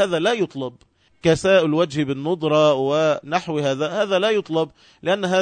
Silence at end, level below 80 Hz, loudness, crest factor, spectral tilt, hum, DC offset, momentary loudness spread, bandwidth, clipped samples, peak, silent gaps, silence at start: 0 s; -56 dBFS; -20 LUFS; 16 dB; -5.5 dB/octave; none; under 0.1%; 8 LU; 9.4 kHz; under 0.1%; -4 dBFS; none; 0 s